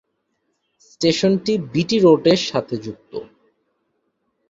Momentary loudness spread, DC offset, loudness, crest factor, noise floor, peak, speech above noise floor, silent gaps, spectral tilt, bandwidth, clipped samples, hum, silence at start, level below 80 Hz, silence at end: 19 LU; under 0.1%; -18 LUFS; 18 dB; -71 dBFS; -2 dBFS; 53 dB; none; -5.5 dB/octave; 7.8 kHz; under 0.1%; none; 1 s; -58 dBFS; 1.25 s